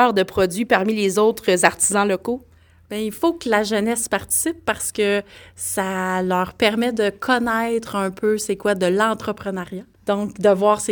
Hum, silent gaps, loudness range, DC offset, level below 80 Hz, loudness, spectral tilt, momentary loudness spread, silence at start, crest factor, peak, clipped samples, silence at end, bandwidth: none; none; 2 LU; under 0.1%; -52 dBFS; -20 LUFS; -3.5 dB/octave; 10 LU; 0 s; 20 dB; 0 dBFS; under 0.1%; 0 s; 19 kHz